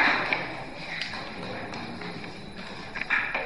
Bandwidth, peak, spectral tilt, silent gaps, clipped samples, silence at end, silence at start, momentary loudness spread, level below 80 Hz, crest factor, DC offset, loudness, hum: 11.5 kHz; -8 dBFS; -4 dB/octave; none; under 0.1%; 0 s; 0 s; 13 LU; -54 dBFS; 22 dB; 0.5%; -31 LUFS; none